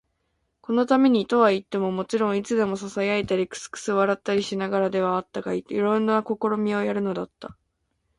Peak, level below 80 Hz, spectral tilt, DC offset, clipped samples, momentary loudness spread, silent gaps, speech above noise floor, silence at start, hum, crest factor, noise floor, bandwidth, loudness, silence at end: -6 dBFS; -62 dBFS; -5.5 dB/octave; under 0.1%; under 0.1%; 10 LU; none; 51 dB; 0.7 s; none; 18 dB; -74 dBFS; 11.5 kHz; -24 LUFS; 0.65 s